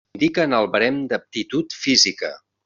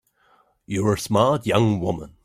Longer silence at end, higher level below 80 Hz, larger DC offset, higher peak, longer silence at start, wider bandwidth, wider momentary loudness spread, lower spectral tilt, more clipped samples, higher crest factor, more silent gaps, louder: first, 0.3 s vs 0.15 s; second, -60 dBFS vs -52 dBFS; neither; about the same, -2 dBFS vs -4 dBFS; second, 0.15 s vs 0.7 s; second, 7.6 kHz vs 16 kHz; about the same, 10 LU vs 8 LU; second, -2 dB/octave vs -6 dB/octave; neither; about the same, 18 dB vs 20 dB; neither; about the same, -19 LUFS vs -21 LUFS